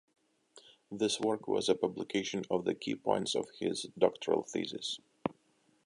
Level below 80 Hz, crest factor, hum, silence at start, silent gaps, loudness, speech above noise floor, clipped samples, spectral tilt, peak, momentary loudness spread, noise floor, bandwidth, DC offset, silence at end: -74 dBFS; 22 dB; none; 0.55 s; none; -34 LUFS; 38 dB; under 0.1%; -4 dB/octave; -12 dBFS; 8 LU; -71 dBFS; 11.5 kHz; under 0.1%; 0.55 s